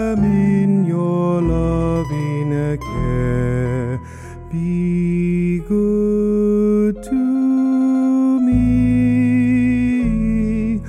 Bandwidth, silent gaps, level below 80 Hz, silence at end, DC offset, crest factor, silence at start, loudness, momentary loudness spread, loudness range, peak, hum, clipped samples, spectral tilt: 10 kHz; none; -30 dBFS; 0 s; under 0.1%; 10 dB; 0 s; -17 LUFS; 6 LU; 5 LU; -6 dBFS; none; under 0.1%; -9.5 dB/octave